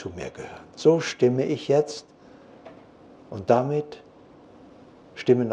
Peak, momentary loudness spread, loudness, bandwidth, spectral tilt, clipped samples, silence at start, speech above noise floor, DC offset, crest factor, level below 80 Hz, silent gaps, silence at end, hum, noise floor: -4 dBFS; 19 LU; -24 LUFS; 9.6 kHz; -6.5 dB/octave; under 0.1%; 0 s; 27 dB; under 0.1%; 20 dB; -64 dBFS; none; 0 s; none; -50 dBFS